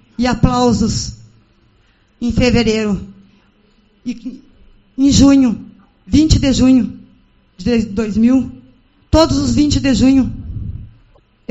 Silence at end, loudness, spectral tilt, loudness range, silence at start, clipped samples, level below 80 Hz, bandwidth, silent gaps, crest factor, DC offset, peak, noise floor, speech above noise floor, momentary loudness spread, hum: 0.65 s; -14 LUFS; -5.5 dB/octave; 6 LU; 0.2 s; under 0.1%; -28 dBFS; 8.2 kHz; none; 16 dB; under 0.1%; 0 dBFS; -54 dBFS; 41 dB; 17 LU; none